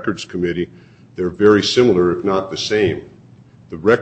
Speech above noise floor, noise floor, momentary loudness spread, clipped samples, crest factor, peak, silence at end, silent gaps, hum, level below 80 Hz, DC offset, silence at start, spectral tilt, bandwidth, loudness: 28 dB; -45 dBFS; 16 LU; under 0.1%; 18 dB; 0 dBFS; 0 s; none; none; -50 dBFS; under 0.1%; 0 s; -5.5 dB/octave; 8.6 kHz; -17 LUFS